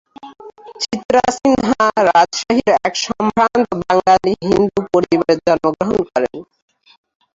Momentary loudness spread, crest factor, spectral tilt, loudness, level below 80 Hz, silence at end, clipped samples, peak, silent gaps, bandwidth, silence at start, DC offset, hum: 7 LU; 14 dB; -4.5 dB/octave; -15 LUFS; -48 dBFS; 0.95 s; under 0.1%; -2 dBFS; 1.05-1.09 s; 7.8 kHz; 0.25 s; under 0.1%; none